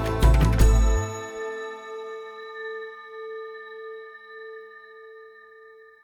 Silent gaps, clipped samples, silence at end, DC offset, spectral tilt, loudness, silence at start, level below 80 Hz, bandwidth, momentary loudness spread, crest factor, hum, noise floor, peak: none; under 0.1%; 0.75 s; under 0.1%; -6 dB/octave; -26 LUFS; 0 s; -26 dBFS; 15 kHz; 25 LU; 20 dB; none; -50 dBFS; -6 dBFS